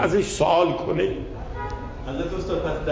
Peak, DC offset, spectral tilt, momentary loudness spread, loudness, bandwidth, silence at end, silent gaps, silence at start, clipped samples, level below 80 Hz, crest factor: -6 dBFS; under 0.1%; -5.5 dB/octave; 13 LU; -25 LUFS; 8 kHz; 0 s; none; 0 s; under 0.1%; -36 dBFS; 16 dB